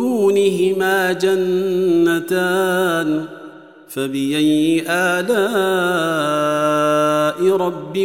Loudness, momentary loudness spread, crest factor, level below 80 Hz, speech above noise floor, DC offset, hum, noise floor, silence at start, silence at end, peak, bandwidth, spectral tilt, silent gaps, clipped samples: -17 LUFS; 6 LU; 12 dB; -70 dBFS; 22 dB; 0.2%; none; -39 dBFS; 0 s; 0 s; -6 dBFS; 16.5 kHz; -5 dB/octave; none; under 0.1%